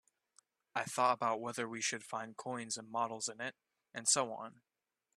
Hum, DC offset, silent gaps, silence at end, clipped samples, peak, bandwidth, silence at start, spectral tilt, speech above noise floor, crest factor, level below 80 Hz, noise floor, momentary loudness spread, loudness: none; under 0.1%; none; 0.65 s; under 0.1%; -16 dBFS; 14 kHz; 0.75 s; -1.5 dB/octave; 35 dB; 22 dB; -86 dBFS; -73 dBFS; 13 LU; -37 LUFS